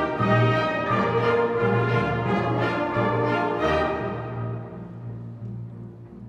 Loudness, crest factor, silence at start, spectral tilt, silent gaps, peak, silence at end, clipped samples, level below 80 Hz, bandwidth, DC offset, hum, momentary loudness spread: -23 LUFS; 14 dB; 0 s; -8 dB/octave; none; -10 dBFS; 0 s; under 0.1%; -48 dBFS; 7.2 kHz; under 0.1%; none; 15 LU